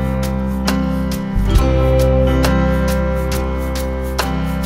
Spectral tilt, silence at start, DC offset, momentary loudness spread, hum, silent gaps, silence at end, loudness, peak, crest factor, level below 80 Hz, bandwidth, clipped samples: -6.5 dB/octave; 0 s; under 0.1%; 7 LU; none; none; 0 s; -17 LUFS; 0 dBFS; 16 dB; -20 dBFS; 16.5 kHz; under 0.1%